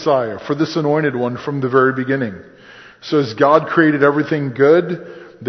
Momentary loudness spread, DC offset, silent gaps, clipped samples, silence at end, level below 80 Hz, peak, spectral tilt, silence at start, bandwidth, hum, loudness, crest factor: 13 LU; under 0.1%; none; under 0.1%; 0 s; -58 dBFS; 0 dBFS; -7.5 dB/octave; 0 s; 6.4 kHz; none; -16 LUFS; 16 dB